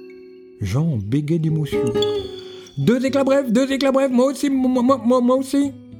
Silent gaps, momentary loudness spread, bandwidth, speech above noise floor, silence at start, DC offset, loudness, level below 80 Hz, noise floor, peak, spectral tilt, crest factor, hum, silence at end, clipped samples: none; 7 LU; 18.5 kHz; 23 dB; 0 s; under 0.1%; -19 LUFS; -50 dBFS; -41 dBFS; -4 dBFS; -6.5 dB/octave; 16 dB; none; 0 s; under 0.1%